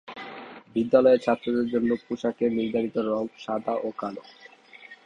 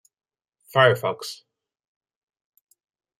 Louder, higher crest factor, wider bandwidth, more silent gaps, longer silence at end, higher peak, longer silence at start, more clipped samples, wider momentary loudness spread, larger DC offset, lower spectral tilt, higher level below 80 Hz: second, -25 LUFS vs -21 LUFS; about the same, 20 dB vs 22 dB; second, 7.6 kHz vs 15.5 kHz; neither; second, 0.1 s vs 1.85 s; about the same, -6 dBFS vs -4 dBFS; second, 0.05 s vs 0.75 s; neither; about the same, 19 LU vs 18 LU; neither; first, -7 dB/octave vs -4.5 dB/octave; first, -64 dBFS vs -72 dBFS